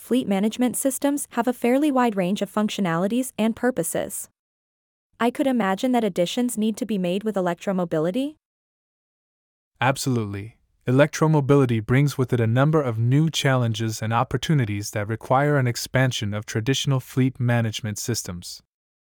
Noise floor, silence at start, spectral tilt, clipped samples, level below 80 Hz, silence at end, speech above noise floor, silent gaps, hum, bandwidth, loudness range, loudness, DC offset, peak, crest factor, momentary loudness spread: under -90 dBFS; 0 s; -5.5 dB/octave; under 0.1%; -56 dBFS; 0.45 s; over 68 dB; 4.39-5.10 s, 8.45-9.71 s; none; 19.5 kHz; 6 LU; -23 LUFS; under 0.1%; -4 dBFS; 20 dB; 8 LU